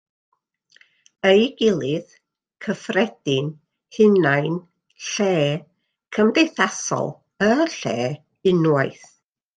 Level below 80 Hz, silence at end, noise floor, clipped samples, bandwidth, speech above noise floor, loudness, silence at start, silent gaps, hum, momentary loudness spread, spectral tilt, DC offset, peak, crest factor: -64 dBFS; 0.65 s; -58 dBFS; under 0.1%; 9.4 kHz; 38 dB; -21 LUFS; 1.25 s; none; none; 13 LU; -5 dB/octave; under 0.1%; -2 dBFS; 20 dB